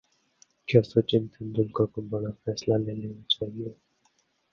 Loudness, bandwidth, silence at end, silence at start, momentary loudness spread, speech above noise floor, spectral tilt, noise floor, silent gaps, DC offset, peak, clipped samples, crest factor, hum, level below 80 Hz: -27 LUFS; 7 kHz; 0.8 s; 0.7 s; 13 LU; 43 dB; -6.5 dB/octave; -70 dBFS; none; under 0.1%; -6 dBFS; under 0.1%; 22 dB; none; -58 dBFS